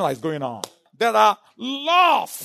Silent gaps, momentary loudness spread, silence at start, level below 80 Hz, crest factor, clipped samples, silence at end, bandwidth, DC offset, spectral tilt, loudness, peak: none; 14 LU; 0 s; -74 dBFS; 16 dB; under 0.1%; 0 s; 13.5 kHz; under 0.1%; -3.5 dB/octave; -20 LUFS; -4 dBFS